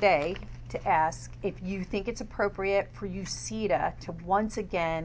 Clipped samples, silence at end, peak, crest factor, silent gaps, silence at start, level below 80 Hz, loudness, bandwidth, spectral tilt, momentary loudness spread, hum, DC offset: under 0.1%; 0 s; -10 dBFS; 20 dB; none; 0 s; -46 dBFS; -30 LUFS; 8 kHz; -5 dB/octave; 10 LU; none; under 0.1%